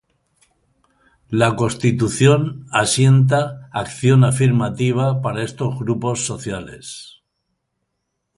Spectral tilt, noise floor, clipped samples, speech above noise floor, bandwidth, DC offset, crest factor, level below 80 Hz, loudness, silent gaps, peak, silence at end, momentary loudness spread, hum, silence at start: -5.5 dB/octave; -75 dBFS; under 0.1%; 58 dB; 11.5 kHz; under 0.1%; 18 dB; -50 dBFS; -18 LUFS; none; 0 dBFS; 1.3 s; 14 LU; none; 1.3 s